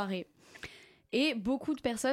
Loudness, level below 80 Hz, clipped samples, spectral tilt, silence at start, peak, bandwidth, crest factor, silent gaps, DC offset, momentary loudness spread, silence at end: -33 LUFS; -64 dBFS; under 0.1%; -4 dB/octave; 0 s; -18 dBFS; 15.5 kHz; 16 dB; none; under 0.1%; 18 LU; 0 s